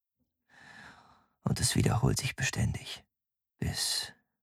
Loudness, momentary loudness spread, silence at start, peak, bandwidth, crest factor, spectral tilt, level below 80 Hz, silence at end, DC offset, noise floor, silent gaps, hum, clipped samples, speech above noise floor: -31 LUFS; 18 LU; 0.65 s; -12 dBFS; 16 kHz; 22 dB; -4 dB/octave; -48 dBFS; 0.3 s; under 0.1%; -90 dBFS; none; none; under 0.1%; 59 dB